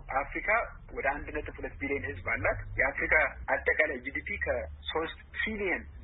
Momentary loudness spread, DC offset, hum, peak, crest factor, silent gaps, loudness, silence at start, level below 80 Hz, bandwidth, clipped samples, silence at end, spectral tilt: 11 LU; under 0.1%; none; -10 dBFS; 22 dB; none; -31 LUFS; 0 s; -46 dBFS; 4.1 kHz; under 0.1%; 0 s; -9 dB/octave